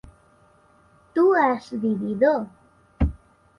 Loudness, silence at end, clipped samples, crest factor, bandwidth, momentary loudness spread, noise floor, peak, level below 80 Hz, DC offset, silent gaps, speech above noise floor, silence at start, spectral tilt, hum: -22 LUFS; 0.4 s; under 0.1%; 16 dB; 11 kHz; 9 LU; -57 dBFS; -8 dBFS; -36 dBFS; under 0.1%; none; 36 dB; 1.15 s; -8.5 dB/octave; none